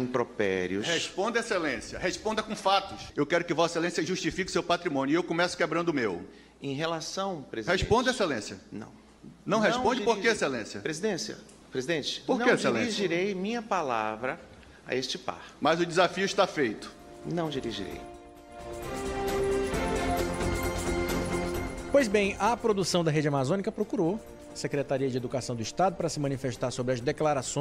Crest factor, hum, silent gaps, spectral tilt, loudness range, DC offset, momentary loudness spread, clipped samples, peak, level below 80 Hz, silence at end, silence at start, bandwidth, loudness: 20 dB; none; none; -4.5 dB/octave; 3 LU; under 0.1%; 12 LU; under 0.1%; -10 dBFS; -48 dBFS; 0 s; 0 s; 16 kHz; -29 LUFS